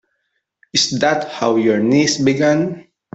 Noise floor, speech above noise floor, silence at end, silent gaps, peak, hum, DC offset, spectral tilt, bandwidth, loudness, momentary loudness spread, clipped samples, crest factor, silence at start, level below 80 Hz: -71 dBFS; 56 dB; 0.3 s; none; -2 dBFS; none; under 0.1%; -4 dB/octave; 8.2 kHz; -16 LUFS; 5 LU; under 0.1%; 16 dB; 0.75 s; -56 dBFS